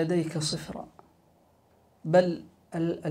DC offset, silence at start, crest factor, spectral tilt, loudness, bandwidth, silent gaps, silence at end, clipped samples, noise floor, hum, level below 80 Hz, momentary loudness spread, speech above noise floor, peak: under 0.1%; 0 s; 20 dB; -5.5 dB/octave; -28 LUFS; 15 kHz; none; 0 s; under 0.1%; -63 dBFS; none; -64 dBFS; 17 LU; 36 dB; -10 dBFS